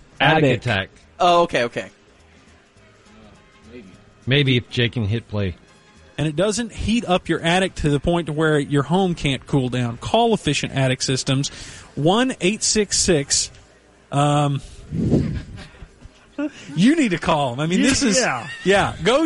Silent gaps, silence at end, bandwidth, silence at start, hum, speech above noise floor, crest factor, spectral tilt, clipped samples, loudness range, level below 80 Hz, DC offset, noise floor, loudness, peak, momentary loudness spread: none; 0 s; 11.5 kHz; 0.2 s; none; 32 dB; 16 dB; -4.5 dB/octave; under 0.1%; 5 LU; -42 dBFS; under 0.1%; -51 dBFS; -20 LUFS; -4 dBFS; 12 LU